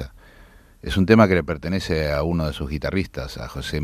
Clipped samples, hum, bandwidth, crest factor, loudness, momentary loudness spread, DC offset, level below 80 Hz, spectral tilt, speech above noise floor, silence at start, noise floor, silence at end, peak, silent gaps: under 0.1%; none; 15 kHz; 20 dB; -22 LUFS; 17 LU; under 0.1%; -38 dBFS; -6.5 dB/octave; 28 dB; 0 s; -49 dBFS; 0 s; -2 dBFS; none